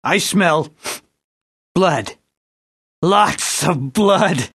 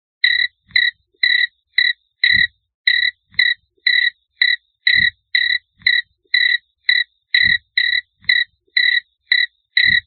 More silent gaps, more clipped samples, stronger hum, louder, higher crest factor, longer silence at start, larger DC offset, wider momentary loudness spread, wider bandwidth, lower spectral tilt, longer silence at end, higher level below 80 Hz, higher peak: first, 1.24-1.75 s, 2.37-3.02 s vs 2.74-2.84 s; neither; neither; about the same, -16 LUFS vs -16 LUFS; about the same, 18 dB vs 18 dB; second, 0.05 s vs 0.25 s; neither; first, 14 LU vs 5 LU; first, 13 kHz vs 4.5 kHz; first, -4 dB/octave vs -1.5 dB/octave; about the same, 0.05 s vs 0.05 s; about the same, -54 dBFS vs -54 dBFS; about the same, 0 dBFS vs 0 dBFS